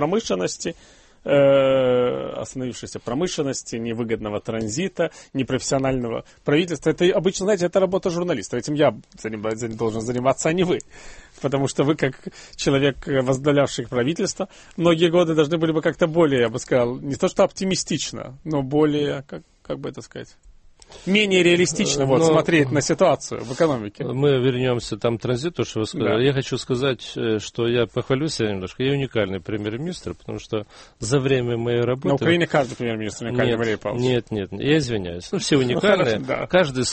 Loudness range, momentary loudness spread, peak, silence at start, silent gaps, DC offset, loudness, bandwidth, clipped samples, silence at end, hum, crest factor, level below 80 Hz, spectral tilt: 5 LU; 12 LU; -2 dBFS; 0 s; none; under 0.1%; -22 LUFS; 8.8 kHz; under 0.1%; 0 s; none; 18 dB; -50 dBFS; -5 dB/octave